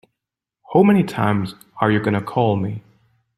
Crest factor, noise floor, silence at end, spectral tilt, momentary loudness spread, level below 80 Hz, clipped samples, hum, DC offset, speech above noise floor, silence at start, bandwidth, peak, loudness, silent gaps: 18 dB; -84 dBFS; 0.6 s; -8 dB/octave; 12 LU; -56 dBFS; under 0.1%; none; under 0.1%; 66 dB; 0.7 s; 13 kHz; -2 dBFS; -19 LUFS; none